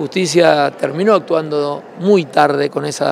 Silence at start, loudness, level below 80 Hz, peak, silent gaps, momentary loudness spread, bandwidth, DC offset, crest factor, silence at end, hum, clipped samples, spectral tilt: 0 s; -15 LUFS; -66 dBFS; 0 dBFS; none; 8 LU; 13.5 kHz; under 0.1%; 14 dB; 0 s; none; under 0.1%; -5 dB/octave